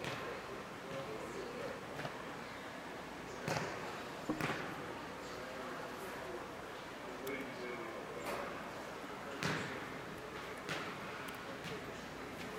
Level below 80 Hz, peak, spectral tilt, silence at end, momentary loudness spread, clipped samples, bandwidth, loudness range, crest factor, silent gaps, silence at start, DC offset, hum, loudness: -68 dBFS; -18 dBFS; -4.5 dB/octave; 0 s; 7 LU; under 0.1%; 16 kHz; 2 LU; 26 dB; none; 0 s; under 0.1%; none; -44 LUFS